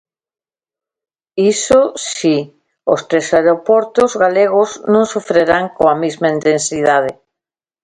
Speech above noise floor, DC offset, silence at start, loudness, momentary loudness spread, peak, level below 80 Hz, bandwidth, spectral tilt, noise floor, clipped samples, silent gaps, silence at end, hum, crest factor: 77 dB; under 0.1%; 1.35 s; -14 LUFS; 6 LU; 0 dBFS; -52 dBFS; 11 kHz; -4 dB/octave; -90 dBFS; under 0.1%; none; 0.7 s; none; 14 dB